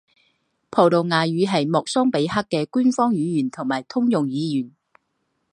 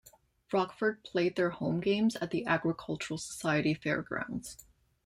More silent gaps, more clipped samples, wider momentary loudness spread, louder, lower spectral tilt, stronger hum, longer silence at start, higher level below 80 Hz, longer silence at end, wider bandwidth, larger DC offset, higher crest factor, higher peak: neither; neither; about the same, 8 LU vs 8 LU; first, -21 LUFS vs -32 LUFS; about the same, -6 dB/octave vs -5.5 dB/octave; neither; first, 0.7 s vs 0.5 s; about the same, -62 dBFS vs -64 dBFS; first, 0.85 s vs 0.45 s; second, 10.5 kHz vs 16 kHz; neither; about the same, 20 dB vs 18 dB; first, -2 dBFS vs -14 dBFS